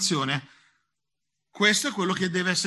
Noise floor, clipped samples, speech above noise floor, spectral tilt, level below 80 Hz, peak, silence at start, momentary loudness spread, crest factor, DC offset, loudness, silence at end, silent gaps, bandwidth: -85 dBFS; under 0.1%; 60 dB; -3 dB/octave; -68 dBFS; -6 dBFS; 0 s; 7 LU; 20 dB; under 0.1%; -24 LUFS; 0 s; none; 12.5 kHz